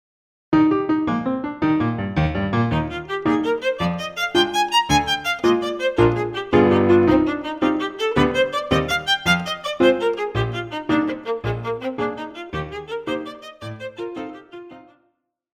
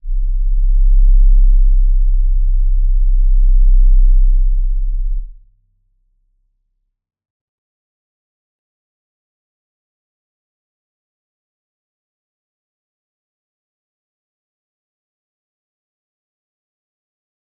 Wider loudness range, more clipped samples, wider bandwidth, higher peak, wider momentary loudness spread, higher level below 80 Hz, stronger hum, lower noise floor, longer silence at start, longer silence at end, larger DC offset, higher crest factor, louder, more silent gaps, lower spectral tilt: second, 10 LU vs 13 LU; neither; first, 15.5 kHz vs 0.2 kHz; about the same, -2 dBFS vs -2 dBFS; first, 13 LU vs 8 LU; second, -42 dBFS vs -14 dBFS; neither; about the same, -69 dBFS vs -68 dBFS; first, 0.5 s vs 0.05 s; second, 0.75 s vs 12.25 s; neither; first, 18 dB vs 12 dB; second, -20 LUFS vs -17 LUFS; neither; second, -5.5 dB/octave vs -15.5 dB/octave